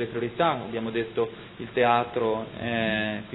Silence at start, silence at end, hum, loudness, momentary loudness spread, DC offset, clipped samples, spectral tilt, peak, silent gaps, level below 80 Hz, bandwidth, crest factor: 0 s; 0 s; none; -27 LUFS; 8 LU; under 0.1%; under 0.1%; -9 dB/octave; -6 dBFS; none; -58 dBFS; 4.1 kHz; 20 dB